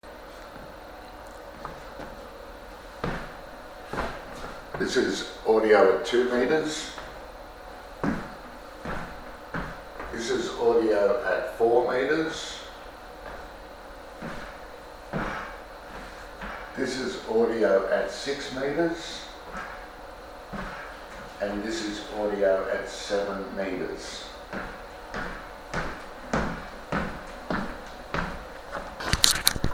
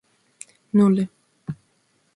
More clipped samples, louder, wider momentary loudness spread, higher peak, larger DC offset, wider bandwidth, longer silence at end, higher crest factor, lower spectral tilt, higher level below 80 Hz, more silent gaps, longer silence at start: neither; second, -28 LUFS vs -20 LUFS; second, 20 LU vs 26 LU; first, 0 dBFS vs -6 dBFS; neither; first, 16 kHz vs 11 kHz; second, 0 s vs 0.6 s; first, 30 dB vs 18 dB; second, -3.5 dB/octave vs -8.5 dB/octave; first, -46 dBFS vs -64 dBFS; neither; second, 0.05 s vs 0.75 s